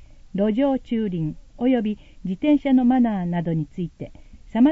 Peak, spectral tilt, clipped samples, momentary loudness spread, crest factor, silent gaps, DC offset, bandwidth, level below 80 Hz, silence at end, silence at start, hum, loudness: -8 dBFS; -9.5 dB/octave; under 0.1%; 14 LU; 14 dB; none; under 0.1%; 4.1 kHz; -46 dBFS; 0 s; 0 s; none; -23 LUFS